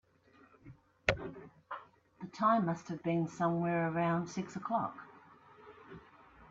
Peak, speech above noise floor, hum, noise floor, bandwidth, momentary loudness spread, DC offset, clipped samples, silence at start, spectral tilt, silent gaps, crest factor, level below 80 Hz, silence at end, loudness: -12 dBFS; 31 dB; none; -65 dBFS; 7.8 kHz; 23 LU; under 0.1%; under 0.1%; 0.65 s; -6.5 dB/octave; none; 24 dB; -64 dBFS; 0.05 s; -34 LUFS